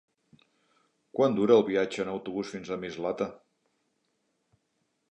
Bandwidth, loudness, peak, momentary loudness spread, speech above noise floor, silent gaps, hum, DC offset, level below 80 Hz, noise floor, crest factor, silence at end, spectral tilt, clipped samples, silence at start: 8.6 kHz; -28 LUFS; -8 dBFS; 13 LU; 50 dB; none; none; under 0.1%; -70 dBFS; -77 dBFS; 22 dB; 1.75 s; -6 dB/octave; under 0.1%; 1.15 s